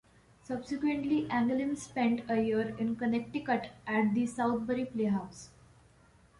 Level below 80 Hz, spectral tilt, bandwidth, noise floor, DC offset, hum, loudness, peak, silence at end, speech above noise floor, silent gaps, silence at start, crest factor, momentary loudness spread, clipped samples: -64 dBFS; -6 dB/octave; 11.5 kHz; -62 dBFS; under 0.1%; none; -32 LUFS; -16 dBFS; 0.9 s; 31 dB; none; 0.5 s; 16 dB; 6 LU; under 0.1%